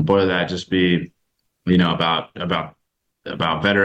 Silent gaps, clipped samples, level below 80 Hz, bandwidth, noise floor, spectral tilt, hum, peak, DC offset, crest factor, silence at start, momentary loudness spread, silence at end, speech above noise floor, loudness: none; under 0.1%; -50 dBFS; 8 kHz; -71 dBFS; -6.5 dB/octave; none; -2 dBFS; under 0.1%; 18 dB; 0 s; 16 LU; 0 s; 52 dB; -20 LUFS